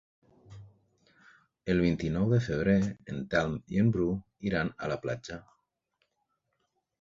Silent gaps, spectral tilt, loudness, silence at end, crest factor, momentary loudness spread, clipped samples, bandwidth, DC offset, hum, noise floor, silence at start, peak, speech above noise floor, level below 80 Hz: none; -7.5 dB/octave; -30 LUFS; 1.6 s; 20 dB; 12 LU; under 0.1%; 7.6 kHz; under 0.1%; none; -80 dBFS; 0.5 s; -12 dBFS; 50 dB; -52 dBFS